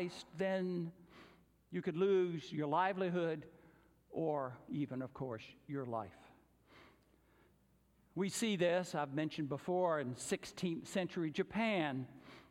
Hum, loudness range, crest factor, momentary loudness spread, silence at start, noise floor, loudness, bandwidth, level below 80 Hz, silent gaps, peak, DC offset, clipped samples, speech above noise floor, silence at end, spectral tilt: none; 8 LU; 18 dB; 11 LU; 0 s; -72 dBFS; -39 LUFS; 16 kHz; -76 dBFS; none; -22 dBFS; under 0.1%; under 0.1%; 34 dB; 0.1 s; -5.5 dB/octave